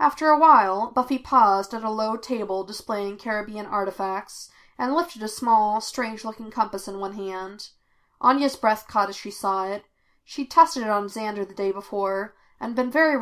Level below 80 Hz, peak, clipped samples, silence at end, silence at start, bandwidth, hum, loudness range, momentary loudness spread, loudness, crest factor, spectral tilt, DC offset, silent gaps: -62 dBFS; -2 dBFS; under 0.1%; 0 s; 0 s; 16 kHz; none; 5 LU; 15 LU; -23 LUFS; 20 dB; -4 dB/octave; under 0.1%; none